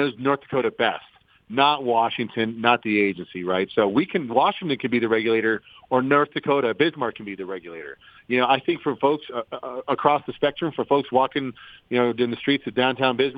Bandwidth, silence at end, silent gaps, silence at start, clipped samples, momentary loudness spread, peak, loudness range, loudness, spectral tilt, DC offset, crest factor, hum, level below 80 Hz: 5 kHz; 0 s; none; 0 s; under 0.1%; 11 LU; -2 dBFS; 2 LU; -23 LUFS; -8 dB/octave; under 0.1%; 20 dB; none; -66 dBFS